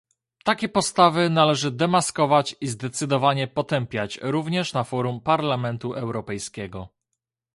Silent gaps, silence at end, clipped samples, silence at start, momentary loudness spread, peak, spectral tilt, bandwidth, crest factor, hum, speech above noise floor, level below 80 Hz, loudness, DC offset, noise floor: none; 0.7 s; under 0.1%; 0.45 s; 11 LU; -2 dBFS; -5 dB/octave; 11.5 kHz; 22 dB; none; 59 dB; -58 dBFS; -23 LUFS; under 0.1%; -82 dBFS